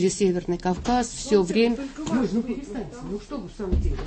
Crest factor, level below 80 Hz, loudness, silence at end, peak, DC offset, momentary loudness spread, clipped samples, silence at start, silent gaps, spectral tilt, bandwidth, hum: 16 dB; -34 dBFS; -25 LUFS; 0 s; -8 dBFS; under 0.1%; 12 LU; under 0.1%; 0 s; none; -5.5 dB/octave; 8.8 kHz; none